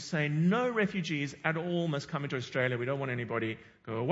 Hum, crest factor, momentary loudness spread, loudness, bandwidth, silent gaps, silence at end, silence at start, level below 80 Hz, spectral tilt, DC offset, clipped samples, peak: none; 20 dB; 8 LU; -32 LUFS; 8 kHz; none; 0 s; 0 s; -70 dBFS; -6.5 dB/octave; under 0.1%; under 0.1%; -12 dBFS